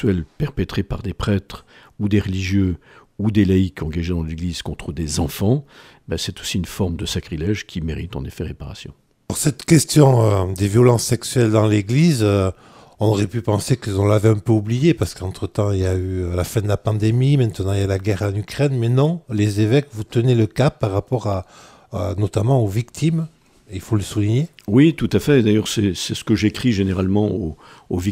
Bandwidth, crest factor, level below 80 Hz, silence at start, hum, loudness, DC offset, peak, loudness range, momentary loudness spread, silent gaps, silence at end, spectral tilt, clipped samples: 16 kHz; 18 dB; -42 dBFS; 0 s; none; -19 LUFS; under 0.1%; 0 dBFS; 7 LU; 12 LU; none; 0 s; -6.5 dB/octave; under 0.1%